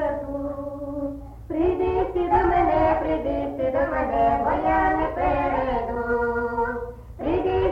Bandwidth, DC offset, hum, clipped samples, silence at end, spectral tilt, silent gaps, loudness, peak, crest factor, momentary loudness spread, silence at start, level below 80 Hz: 7 kHz; under 0.1%; none; under 0.1%; 0 s; -8.5 dB/octave; none; -24 LUFS; -8 dBFS; 14 dB; 11 LU; 0 s; -36 dBFS